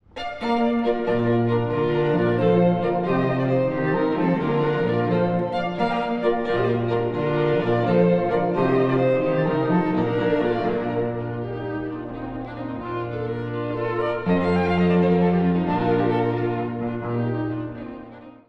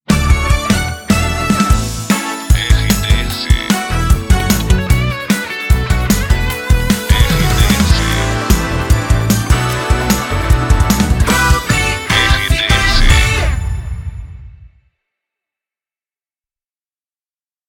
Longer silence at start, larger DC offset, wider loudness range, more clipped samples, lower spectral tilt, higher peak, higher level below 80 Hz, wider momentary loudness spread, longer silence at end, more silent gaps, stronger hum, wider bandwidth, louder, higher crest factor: about the same, 0.15 s vs 0.1 s; neither; about the same, 5 LU vs 3 LU; neither; first, -9.5 dB/octave vs -4.5 dB/octave; second, -8 dBFS vs 0 dBFS; second, -50 dBFS vs -16 dBFS; first, 10 LU vs 5 LU; second, 0.15 s vs 3 s; neither; neither; second, 6 kHz vs 17.5 kHz; second, -22 LUFS vs -13 LUFS; about the same, 14 dB vs 14 dB